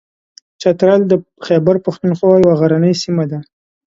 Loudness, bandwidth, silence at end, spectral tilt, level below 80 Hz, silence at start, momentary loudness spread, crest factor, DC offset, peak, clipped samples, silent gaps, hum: -13 LUFS; 7.8 kHz; 0.45 s; -7.5 dB/octave; -52 dBFS; 0.6 s; 8 LU; 14 dB; under 0.1%; 0 dBFS; under 0.1%; none; none